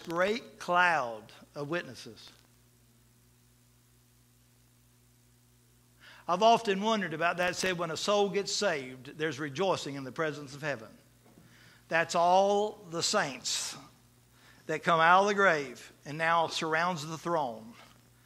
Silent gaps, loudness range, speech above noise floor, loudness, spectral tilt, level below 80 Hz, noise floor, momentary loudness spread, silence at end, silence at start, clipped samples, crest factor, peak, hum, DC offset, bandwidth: none; 7 LU; 34 dB; -29 LUFS; -3.5 dB/octave; -70 dBFS; -64 dBFS; 18 LU; 0.4 s; 0 s; under 0.1%; 24 dB; -8 dBFS; 60 Hz at -65 dBFS; under 0.1%; 16 kHz